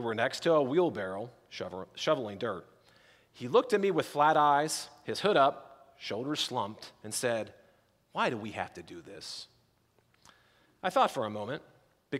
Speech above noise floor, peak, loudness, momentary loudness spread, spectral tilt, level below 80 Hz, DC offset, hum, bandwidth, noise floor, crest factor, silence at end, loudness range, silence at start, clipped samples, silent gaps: 39 dB; -12 dBFS; -31 LUFS; 18 LU; -4 dB/octave; -76 dBFS; under 0.1%; none; 16 kHz; -70 dBFS; 20 dB; 0 s; 8 LU; 0 s; under 0.1%; none